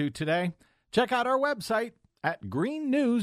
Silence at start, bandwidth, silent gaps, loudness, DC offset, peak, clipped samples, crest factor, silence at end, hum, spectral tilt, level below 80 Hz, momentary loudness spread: 0 s; 15.5 kHz; none; -29 LUFS; under 0.1%; -10 dBFS; under 0.1%; 18 dB; 0 s; none; -6 dB/octave; -64 dBFS; 8 LU